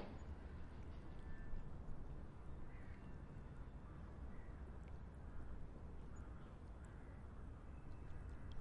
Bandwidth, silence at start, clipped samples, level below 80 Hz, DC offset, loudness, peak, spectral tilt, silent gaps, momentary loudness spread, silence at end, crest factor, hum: 8.6 kHz; 0 s; under 0.1%; -54 dBFS; under 0.1%; -57 LUFS; -36 dBFS; -8 dB/octave; none; 2 LU; 0 s; 16 dB; none